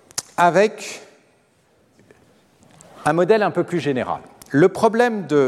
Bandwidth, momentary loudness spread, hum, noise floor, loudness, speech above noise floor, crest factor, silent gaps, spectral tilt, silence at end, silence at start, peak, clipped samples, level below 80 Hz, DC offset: 14 kHz; 14 LU; none; -59 dBFS; -19 LUFS; 41 dB; 18 dB; none; -5.5 dB/octave; 0 s; 0.15 s; -2 dBFS; under 0.1%; -62 dBFS; under 0.1%